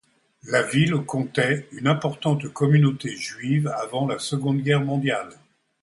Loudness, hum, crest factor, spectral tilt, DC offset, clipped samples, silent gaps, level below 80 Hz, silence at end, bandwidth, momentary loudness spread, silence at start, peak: -23 LUFS; none; 18 dB; -6 dB/octave; under 0.1%; under 0.1%; none; -64 dBFS; 0.5 s; 11.5 kHz; 7 LU; 0.45 s; -6 dBFS